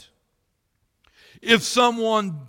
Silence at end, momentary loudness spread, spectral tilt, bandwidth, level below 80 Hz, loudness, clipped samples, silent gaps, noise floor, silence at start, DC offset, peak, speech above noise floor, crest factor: 0 s; 7 LU; -3 dB/octave; 17 kHz; -62 dBFS; -19 LUFS; under 0.1%; none; -72 dBFS; 1.45 s; under 0.1%; -2 dBFS; 52 dB; 22 dB